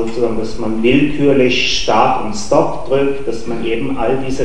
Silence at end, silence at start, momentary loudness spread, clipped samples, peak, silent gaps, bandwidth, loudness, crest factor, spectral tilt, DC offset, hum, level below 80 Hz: 0 s; 0 s; 8 LU; under 0.1%; 0 dBFS; none; 10 kHz; -15 LUFS; 16 dB; -5 dB/octave; 10%; none; -36 dBFS